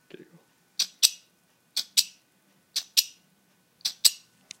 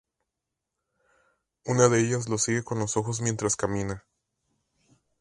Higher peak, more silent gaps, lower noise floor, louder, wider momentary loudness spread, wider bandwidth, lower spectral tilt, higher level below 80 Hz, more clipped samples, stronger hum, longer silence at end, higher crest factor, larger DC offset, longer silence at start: first, 0 dBFS vs -4 dBFS; neither; second, -66 dBFS vs -85 dBFS; about the same, -25 LUFS vs -26 LUFS; first, 16 LU vs 12 LU; first, 16.5 kHz vs 11.5 kHz; second, 3.5 dB/octave vs -4.5 dB/octave; second, under -90 dBFS vs -56 dBFS; neither; neither; second, 0.45 s vs 1.2 s; first, 30 dB vs 24 dB; neither; second, 0.8 s vs 1.65 s